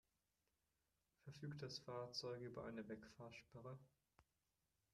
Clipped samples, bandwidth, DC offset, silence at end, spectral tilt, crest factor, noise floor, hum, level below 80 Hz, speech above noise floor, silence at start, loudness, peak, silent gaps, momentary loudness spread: under 0.1%; 13 kHz; under 0.1%; 0.7 s; -5 dB/octave; 20 dB; under -90 dBFS; none; -82 dBFS; over 36 dB; 1.25 s; -54 LUFS; -36 dBFS; none; 11 LU